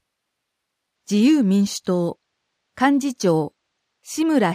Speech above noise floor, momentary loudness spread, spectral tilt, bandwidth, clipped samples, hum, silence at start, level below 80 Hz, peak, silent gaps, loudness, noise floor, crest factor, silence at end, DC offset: 60 dB; 9 LU; -5.5 dB/octave; 15.5 kHz; under 0.1%; none; 1.1 s; -66 dBFS; -4 dBFS; none; -20 LUFS; -78 dBFS; 18 dB; 0 s; under 0.1%